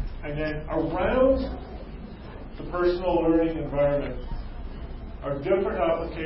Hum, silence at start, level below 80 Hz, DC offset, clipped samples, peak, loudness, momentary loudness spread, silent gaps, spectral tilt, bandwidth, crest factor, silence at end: none; 0 s; -38 dBFS; under 0.1%; under 0.1%; -10 dBFS; -26 LUFS; 18 LU; none; -11.5 dB/octave; 5.8 kHz; 16 dB; 0 s